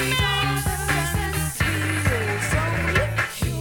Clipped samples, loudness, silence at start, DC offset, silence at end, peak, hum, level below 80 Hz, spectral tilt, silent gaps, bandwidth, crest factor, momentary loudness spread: under 0.1%; -22 LUFS; 0 s; under 0.1%; 0 s; -8 dBFS; none; -32 dBFS; -4 dB/octave; none; 19 kHz; 16 dB; 4 LU